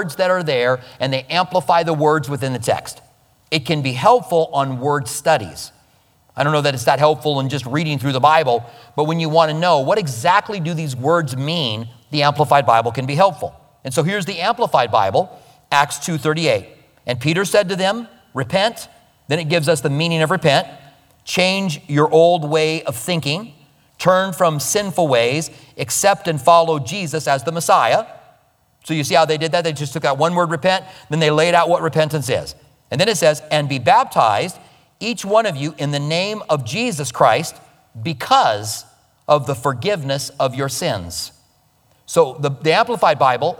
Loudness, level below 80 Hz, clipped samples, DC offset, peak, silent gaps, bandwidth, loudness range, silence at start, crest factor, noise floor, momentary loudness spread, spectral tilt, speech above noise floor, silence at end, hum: -17 LUFS; -58 dBFS; under 0.1%; under 0.1%; 0 dBFS; none; 19 kHz; 3 LU; 0 s; 18 dB; -58 dBFS; 10 LU; -4.5 dB/octave; 40 dB; 0.05 s; none